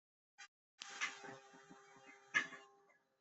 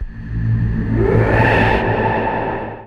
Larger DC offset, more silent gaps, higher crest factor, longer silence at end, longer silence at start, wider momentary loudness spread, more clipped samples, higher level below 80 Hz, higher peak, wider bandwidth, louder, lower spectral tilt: neither; first, 0.48-0.78 s vs none; first, 28 dB vs 14 dB; first, 0.45 s vs 0 s; first, 0.4 s vs 0 s; first, 22 LU vs 9 LU; neither; second, under -90 dBFS vs -26 dBFS; second, -22 dBFS vs -2 dBFS; first, 8.2 kHz vs 6.2 kHz; second, -44 LUFS vs -16 LUFS; second, -0.5 dB/octave vs -8.5 dB/octave